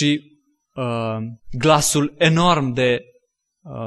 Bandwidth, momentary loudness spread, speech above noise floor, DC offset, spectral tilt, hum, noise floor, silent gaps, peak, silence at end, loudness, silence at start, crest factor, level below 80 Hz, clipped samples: 12.5 kHz; 14 LU; 45 dB; under 0.1%; -4.5 dB/octave; none; -63 dBFS; none; -2 dBFS; 0 s; -19 LUFS; 0 s; 18 dB; -46 dBFS; under 0.1%